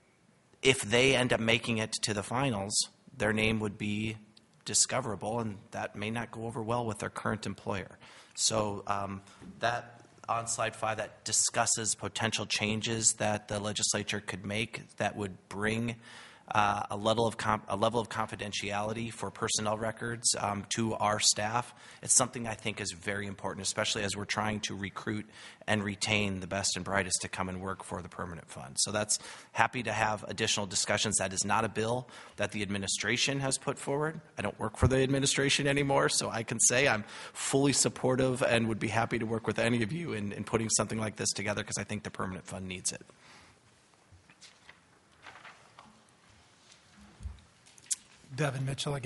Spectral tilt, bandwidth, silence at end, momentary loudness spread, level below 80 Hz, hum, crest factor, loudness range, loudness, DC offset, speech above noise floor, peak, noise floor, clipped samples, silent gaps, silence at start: -3 dB/octave; 11.5 kHz; 0 s; 12 LU; -58 dBFS; none; 28 dB; 6 LU; -31 LUFS; under 0.1%; 34 dB; -6 dBFS; -65 dBFS; under 0.1%; none; 0.65 s